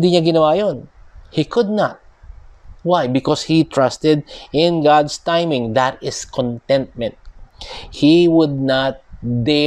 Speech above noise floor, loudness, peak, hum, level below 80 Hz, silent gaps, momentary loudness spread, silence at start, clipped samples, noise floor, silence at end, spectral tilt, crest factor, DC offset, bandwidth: 24 dB; -17 LUFS; -2 dBFS; none; -44 dBFS; none; 13 LU; 0 s; under 0.1%; -39 dBFS; 0 s; -6 dB/octave; 16 dB; under 0.1%; 10 kHz